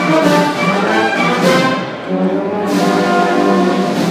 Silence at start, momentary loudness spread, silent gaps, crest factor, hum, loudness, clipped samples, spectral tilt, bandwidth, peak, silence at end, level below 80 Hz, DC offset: 0 s; 5 LU; none; 14 dB; none; -13 LUFS; under 0.1%; -5.5 dB/octave; 15.5 kHz; 0 dBFS; 0 s; -56 dBFS; under 0.1%